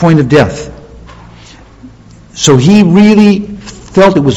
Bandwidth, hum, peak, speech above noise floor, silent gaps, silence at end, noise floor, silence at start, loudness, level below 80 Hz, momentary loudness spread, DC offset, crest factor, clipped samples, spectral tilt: 8.2 kHz; none; 0 dBFS; 29 dB; none; 0 s; -35 dBFS; 0 s; -7 LUFS; -36 dBFS; 20 LU; under 0.1%; 8 dB; 4%; -6 dB/octave